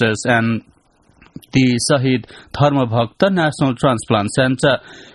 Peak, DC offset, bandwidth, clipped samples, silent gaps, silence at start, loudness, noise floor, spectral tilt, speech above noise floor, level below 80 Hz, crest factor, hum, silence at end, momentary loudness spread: 0 dBFS; under 0.1%; 11.5 kHz; under 0.1%; none; 0 s; -17 LUFS; -55 dBFS; -5.5 dB/octave; 38 dB; -48 dBFS; 16 dB; none; 0.1 s; 6 LU